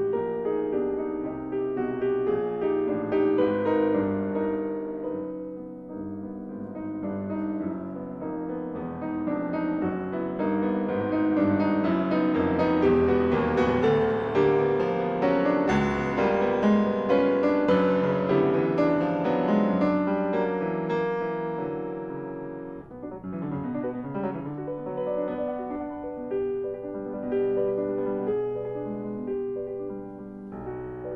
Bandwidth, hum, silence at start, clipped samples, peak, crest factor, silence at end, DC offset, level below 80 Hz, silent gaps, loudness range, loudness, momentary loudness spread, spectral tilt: 6.6 kHz; none; 0 s; under 0.1%; -10 dBFS; 16 dB; 0 s; under 0.1%; -54 dBFS; none; 10 LU; -27 LUFS; 13 LU; -8.5 dB/octave